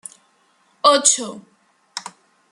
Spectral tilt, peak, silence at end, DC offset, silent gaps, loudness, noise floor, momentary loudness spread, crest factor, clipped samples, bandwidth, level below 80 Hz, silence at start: 0 dB/octave; 0 dBFS; 0.45 s; under 0.1%; none; -15 LUFS; -60 dBFS; 24 LU; 22 dB; under 0.1%; 13 kHz; -78 dBFS; 0.85 s